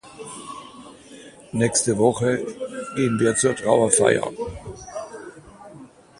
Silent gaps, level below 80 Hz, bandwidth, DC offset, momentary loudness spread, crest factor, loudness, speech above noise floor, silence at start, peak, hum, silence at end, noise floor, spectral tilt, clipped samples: none; -52 dBFS; 11.5 kHz; under 0.1%; 21 LU; 22 dB; -21 LUFS; 25 dB; 0.05 s; -2 dBFS; none; 0.35 s; -45 dBFS; -4 dB/octave; under 0.1%